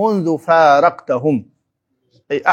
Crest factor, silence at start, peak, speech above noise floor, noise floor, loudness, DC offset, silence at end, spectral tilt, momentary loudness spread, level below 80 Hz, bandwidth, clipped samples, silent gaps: 16 dB; 0 s; 0 dBFS; 56 dB; -70 dBFS; -15 LUFS; under 0.1%; 0 s; -6.5 dB/octave; 10 LU; -70 dBFS; 9.6 kHz; under 0.1%; none